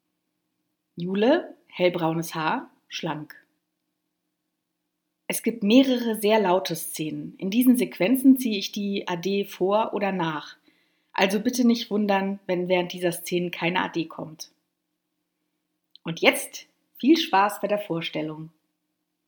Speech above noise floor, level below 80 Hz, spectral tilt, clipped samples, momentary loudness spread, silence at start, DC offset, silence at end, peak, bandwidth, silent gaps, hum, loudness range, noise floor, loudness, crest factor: 56 dB; -78 dBFS; -5 dB/octave; under 0.1%; 16 LU; 0.95 s; under 0.1%; 0.8 s; 0 dBFS; over 20 kHz; none; none; 7 LU; -80 dBFS; -24 LUFS; 24 dB